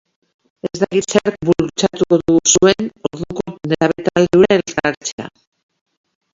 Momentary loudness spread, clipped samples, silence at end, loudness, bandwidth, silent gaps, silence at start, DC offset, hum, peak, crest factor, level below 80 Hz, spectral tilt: 14 LU; under 0.1%; 1.05 s; -16 LUFS; 7.8 kHz; 4.97-5.01 s, 5.12-5.18 s; 0.65 s; under 0.1%; none; 0 dBFS; 16 dB; -48 dBFS; -4 dB/octave